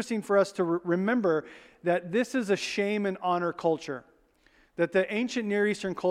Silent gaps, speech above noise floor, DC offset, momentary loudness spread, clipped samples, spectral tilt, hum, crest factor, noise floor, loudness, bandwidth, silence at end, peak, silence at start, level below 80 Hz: none; 36 dB; under 0.1%; 6 LU; under 0.1%; -5.5 dB/octave; none; 18 dB; -63 dBFS; -28 LUFS; 14 kHz; 0 s; -12 dBFS; 0 s; -70 dBFS